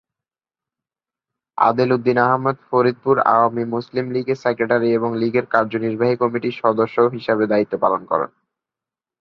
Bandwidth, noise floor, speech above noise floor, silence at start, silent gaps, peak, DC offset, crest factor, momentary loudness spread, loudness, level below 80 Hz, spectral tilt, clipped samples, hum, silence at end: 6.4 kHz; under -90 dBFS; over 72 dB; 1.55 s; none; 0 dBFS; under 0.1%; 18 dB; 7 LU; -19 LUFS; -62 dBFS; -8.5 dB/octave; under 0.1%; none; 0.95 s